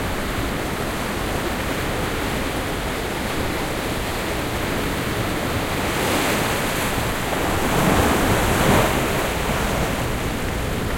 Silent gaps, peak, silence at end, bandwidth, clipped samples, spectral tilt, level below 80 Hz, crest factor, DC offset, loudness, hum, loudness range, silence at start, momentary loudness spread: none; -4 dBFS; 0 s; 16.5 kHz; under 0.1%; -4.5 dB/octave; -32 dBFS; 18 dB; under 0.1%; -22 LUFS; none; 5 LU; 0 s; 7 LU